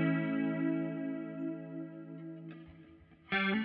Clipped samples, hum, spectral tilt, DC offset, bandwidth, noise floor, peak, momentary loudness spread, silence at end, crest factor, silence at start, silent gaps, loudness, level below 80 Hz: under 0.1%; none; -5 dB/octave; under 0.1%; 5 kHz; -58 dBFS; -22 dBFS; 18 LU; 0 s; 16 dB; 0 s; none; -37 LUFS; -74 dBFS